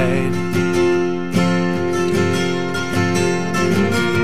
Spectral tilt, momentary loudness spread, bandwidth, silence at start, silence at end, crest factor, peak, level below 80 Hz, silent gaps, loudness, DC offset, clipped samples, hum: -5.5 dB/octave; 3 LU; 15.5 kHz; 0 s; 0 s; 14 dB; -4 dBFS; -50 dBFS; none; -18 LUFS; 3%; under 0.1%; none